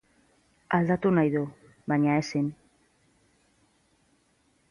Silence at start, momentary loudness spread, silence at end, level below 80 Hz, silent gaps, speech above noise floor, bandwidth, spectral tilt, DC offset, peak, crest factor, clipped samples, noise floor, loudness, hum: 0.7 s; 10 LU; 2.15 s; -64 dBFS; none; 43 dB; 11 kHz; -7.5 dB/octave; under 0.1%; -10 dBFS; 20 dB; under 0.1%; -68 dBFS; -27 LUFS; none